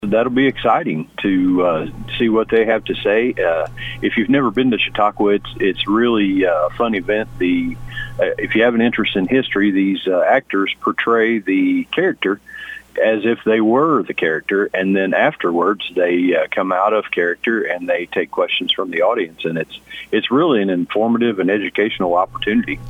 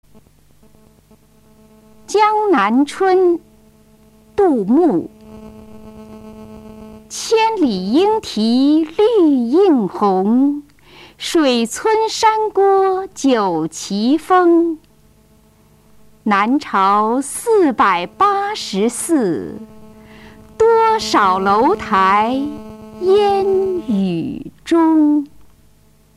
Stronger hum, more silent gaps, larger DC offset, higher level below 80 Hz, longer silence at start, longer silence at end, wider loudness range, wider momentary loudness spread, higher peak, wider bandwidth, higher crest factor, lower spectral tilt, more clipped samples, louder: neither; neither; neither; first, -44 dBFS vs -52 dBFS; second, 0 s vs 2.1 s; second, 0 s vs 0.9 s; about the same, 2 LU vs 4 LU; second, 6 LU vs 13 LU; about the same, -2 dBFS vs -2 dBFS; second, 7.8 kHz vs 14 kHz; about the same, 16 dB vs 14 dB; first, -7 dB/octave vs -5 dB/octave; neither; about the same, -17 LUFS vs -15 LUFS